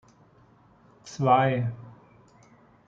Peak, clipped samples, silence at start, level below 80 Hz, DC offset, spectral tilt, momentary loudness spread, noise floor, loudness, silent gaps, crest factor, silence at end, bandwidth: -8 dBFS; under 0.1%; 1.05 s; -66 dBFS; under 0.1%; -7 dB/octave; 22 LU; -58 dBFS; -24 LUFS; none; 22 dB; 1 s; 7.6 kHz